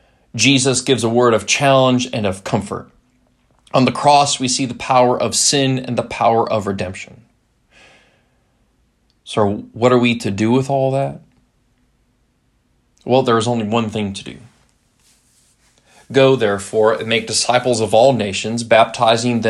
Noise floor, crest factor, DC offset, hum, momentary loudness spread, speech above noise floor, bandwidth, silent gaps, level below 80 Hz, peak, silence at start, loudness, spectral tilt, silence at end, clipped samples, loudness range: -61 dBFS; 18 dB; under 0.1%; none; 11 LU; 46 dB; 13 kHz; none; -56 dBFS; 0 dBFS; 0.35 s; -16 LUFS; -4 dB/octave; 0 s; under 0.1%; 6 LU